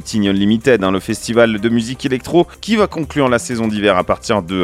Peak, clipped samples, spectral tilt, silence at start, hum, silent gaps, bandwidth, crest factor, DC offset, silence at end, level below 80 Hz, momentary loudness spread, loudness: 0 dBFS; under 0.1%; -5.5 dB/octave; 0 s; none; none; 15 kHz; 16 dB; under 0.1%; 0 s; -42 dBFS; 5 LU; -15 LUFS